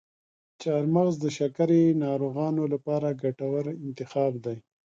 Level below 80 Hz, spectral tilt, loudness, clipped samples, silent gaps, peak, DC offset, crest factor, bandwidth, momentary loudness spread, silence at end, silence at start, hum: -72 dBFS; -8 dB/octave; -27 LUFS; under 0.1%; none; -12 dBFS; under 0.1%; 14 dB; 7.6 kHz; 12 LU; 0.25 s; 0.6 s; none